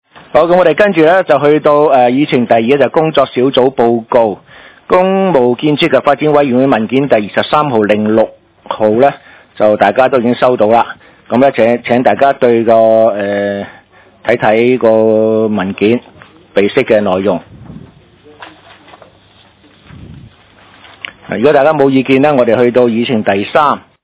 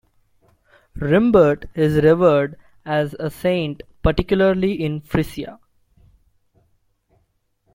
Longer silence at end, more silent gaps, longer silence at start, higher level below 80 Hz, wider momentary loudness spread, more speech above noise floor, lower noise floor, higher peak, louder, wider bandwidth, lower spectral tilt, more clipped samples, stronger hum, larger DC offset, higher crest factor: second, 0.25 s vs 2.2 s; neither; second, 0.35 s vs 0.95 s; second, -48 dBFS vs -38 dBFS; second, 7 LU vs 14 LU; second, 35 dB vs 49 dB; second, -45 dBFS vs -67 dBFS; about the same, 0 dBFS vs -2 dBFS; first, -10 LUFS vs -19 LUFS; second, 4 kHz vs 16.5 kHz; first, -10 dB/octave vs -8 dB/octave; first, 2% vs under 0.1%; neither; neither; second, 10 dB vs 18 dB